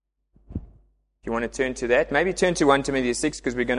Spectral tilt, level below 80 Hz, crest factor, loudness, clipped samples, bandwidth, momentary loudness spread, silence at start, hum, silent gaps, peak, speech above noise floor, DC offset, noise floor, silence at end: -4 dB/octave; -44 dBFS; 20 dB; -23 LUFS; under 0.1%; 11.5 kHz; 18 LU; 0.5 s; none; none; -4 dBFS; 37 dB; under 0.1%; -60 dBFS; 0 s